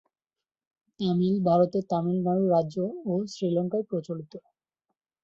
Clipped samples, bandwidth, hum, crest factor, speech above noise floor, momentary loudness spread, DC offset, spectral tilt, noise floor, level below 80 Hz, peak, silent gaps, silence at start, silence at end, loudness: under 0.1%; 7.4 kHz; none; 18 dB; over 64 dB; 10 LU; under 0.1%; -9 dB/octave; under -90 dBFS; -70 dBFS; -10 dBFS; none; 1 s; 0.85 s; -27 LUFS